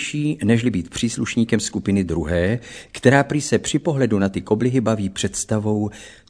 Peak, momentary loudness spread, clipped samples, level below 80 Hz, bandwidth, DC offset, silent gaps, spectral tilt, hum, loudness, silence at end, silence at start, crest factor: 0 dBFS; 6 LU; under 0.1%; -44 dBFS; 11 kHz; 0.1%; none; -5.5 dB/octave; none; -20 LUFS; 0.2 s; 0 s; 20 dB